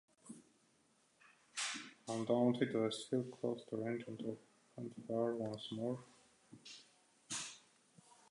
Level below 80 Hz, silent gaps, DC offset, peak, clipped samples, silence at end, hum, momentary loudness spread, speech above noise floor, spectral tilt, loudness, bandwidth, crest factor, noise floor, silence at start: -86 dBFS; none; under 0.1%; -22 dBFS; under 0.1%; 0.7 s; none; 23 LU; 35 dB; -4.5 dB/octave; -41 LUFS; 11 kHz; 22 dB; -75 dBFS; 0.25 s